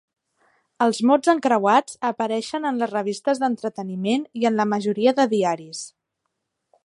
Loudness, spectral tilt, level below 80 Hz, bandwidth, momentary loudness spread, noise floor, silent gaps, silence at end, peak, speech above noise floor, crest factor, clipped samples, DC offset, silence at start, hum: -21 LUFS; -5 dB/octave; -72 dBFS; 11.5 kHz; 10 LU; -78 dBFS; none; 1 s; -4 dBFS; 57 dB; 18 dB; under 0.1%; under 0.1%; 0.8 s; none